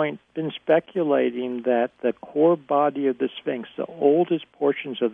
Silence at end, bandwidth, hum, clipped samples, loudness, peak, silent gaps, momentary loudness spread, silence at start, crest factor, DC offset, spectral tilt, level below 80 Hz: 0 s; 3.8 kHz; none; under 0.1%; -23 LUFS; -6 dBFS; none; 10 LU; 0 s; 18 dB; under 0.1%; -9 dB/octave; -74 dBFS